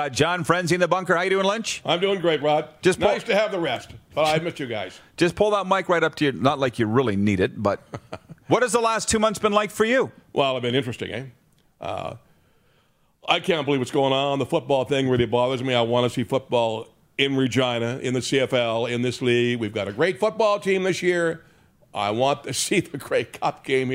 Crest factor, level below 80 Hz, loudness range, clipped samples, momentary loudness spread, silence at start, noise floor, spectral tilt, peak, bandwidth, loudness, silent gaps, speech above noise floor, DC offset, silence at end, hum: 20 dB; -56 dBFS; 3 LU; under 0.1%; 11 LU; 0 s; -63 dBFS; -4.5 dB/octave; -4 dBFS; 16 kHz; -22 LUFS; none; 40 dB; under 0.1%; 0 s; none